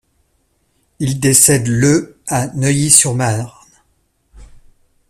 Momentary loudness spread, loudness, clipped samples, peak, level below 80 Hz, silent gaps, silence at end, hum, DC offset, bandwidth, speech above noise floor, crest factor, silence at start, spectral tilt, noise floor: 13 LU; -12 LUFS; under 0.1%; 0 dBFS; -46 dBFS; none; 0.65 s; none; under 0.1%; 16 kHz; 48 dB; 16 dB; 1 s; -4 dB/octave; -62 dBFS